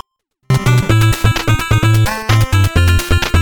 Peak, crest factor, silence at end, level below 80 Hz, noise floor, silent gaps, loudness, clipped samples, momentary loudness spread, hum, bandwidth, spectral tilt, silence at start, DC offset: 0 dBFS; 12 dB; 0 s; -22 dBFS; -43 dBFS; none; -13 LUFS; under 0.1%; 3 LU; none; 19.5 kHz; -5 dB/octave; 0.5 s; under 0.1%